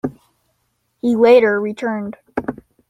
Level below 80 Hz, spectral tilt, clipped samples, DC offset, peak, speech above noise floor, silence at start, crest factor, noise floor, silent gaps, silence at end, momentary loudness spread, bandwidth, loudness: -56 dBFS; -7 dB/octave; under 0.1%; under 0.1%; -2 dBFS; 53 dB; 0.05 s; 16 dB; -68 dBFS; none; 0.35 s; 16 LU; 9.2 kHz; -16 LUFS